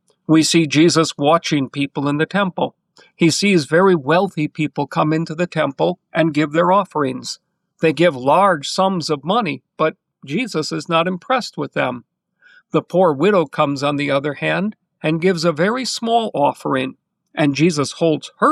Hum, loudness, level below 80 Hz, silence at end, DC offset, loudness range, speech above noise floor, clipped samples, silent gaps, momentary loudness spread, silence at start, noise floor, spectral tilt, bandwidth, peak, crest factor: none; -18 LUFS; -64 dBFS; 0 s; under 0.1%; 3 LU; 36 dB; under 0.1%; none; 8 LU; 0.3 s; -53 dBFS; -5 dB/octave; 13 kHz; -4 dBFS; 14 dB